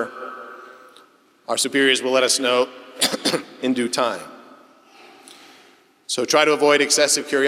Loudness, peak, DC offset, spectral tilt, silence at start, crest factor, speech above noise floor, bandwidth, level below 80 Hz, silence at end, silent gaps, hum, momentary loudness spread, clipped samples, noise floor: -19 LUFS; 0 dBFS; under 0.1%; -1.5 dB/octave; 0 s; 20 dB; 34 dB; 16.5 kHz; -80 dBFS; 0 s; none; none; 19 LU; under 0.1%; -53 dBFS